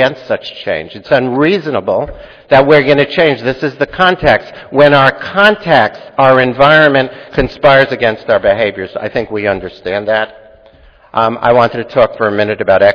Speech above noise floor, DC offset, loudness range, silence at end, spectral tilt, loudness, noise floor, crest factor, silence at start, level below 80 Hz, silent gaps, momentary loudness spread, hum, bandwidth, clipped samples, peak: 32 dB; under 0.1%; 6 LU; 0 s; -7 dB/octave; -11 LUFS; -42 dBFS; 12 dB; 0 s; -38 dBFS; none; 11 LU; none; 5.4 kHz; 0.6%; 0 dBFS